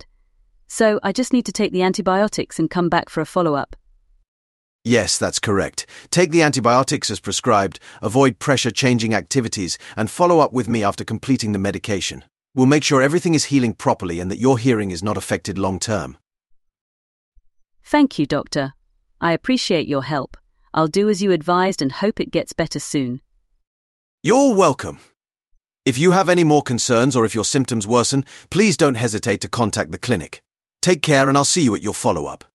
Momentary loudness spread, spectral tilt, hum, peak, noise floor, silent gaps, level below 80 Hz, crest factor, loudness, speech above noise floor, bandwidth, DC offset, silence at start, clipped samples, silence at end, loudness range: 10 LU; -4.5 dB/octave; none; -2 dBFS; -64 dBFS; 4.28-4.79 s, 16.81-17.32 s, 23.67-24.18 s; -50 dBFS; 18 dB; -19 LUFS; 46 dB; 12.5 kHz; under 0.1%; 0.7 s; under 0.1%; 0.2 s; 5 LU